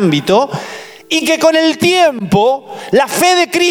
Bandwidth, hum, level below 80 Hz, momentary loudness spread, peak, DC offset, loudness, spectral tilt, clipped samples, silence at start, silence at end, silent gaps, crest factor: 18.5 kHz; none; -52 dBFS; 10 LU; -2 dBFS; under 0.1%; -12 LUFS; -4 dB/octave; under 0.1%; 0 s; 0 s; none; 12 dB